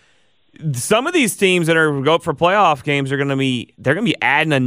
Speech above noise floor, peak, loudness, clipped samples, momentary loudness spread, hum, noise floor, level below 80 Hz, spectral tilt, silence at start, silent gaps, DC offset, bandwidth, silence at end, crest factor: 43 dB; -2 dBFS; -16 LUFS; under 0.1%; 7 LU; none; -59 dBFS; -56 dBFS; -4.5 dB/octave; 0.6 s; none; under 0.1%; 16 kHz; 0 s; 14 dB